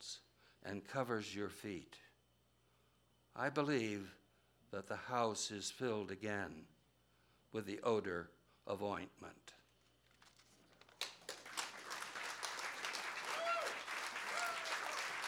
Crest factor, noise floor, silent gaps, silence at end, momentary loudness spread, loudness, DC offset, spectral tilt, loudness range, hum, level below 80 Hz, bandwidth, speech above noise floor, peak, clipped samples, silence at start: 24 dB; -76 dBFS; none; 0 s; 15 LU; -43 LUFS; under 0.1%; -3.5 dB/octave; 7 LU; none; -80 dBFS; 19 kHz; 33 dB; -20 dBFS; under 0.1%; 0 s